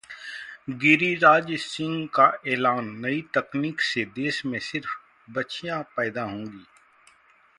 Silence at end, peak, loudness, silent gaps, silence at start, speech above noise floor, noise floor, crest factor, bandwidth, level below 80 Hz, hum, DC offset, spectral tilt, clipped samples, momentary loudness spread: 0.95 s; -4 dBFS; -24 LUFS; none; 0.1 s; 34 dB; -59 dBFS; 22 dB; 11.5 kHz; -68 dBFS; none; under 0.1%; -5 dB/octave; under 0.1%; 18 LU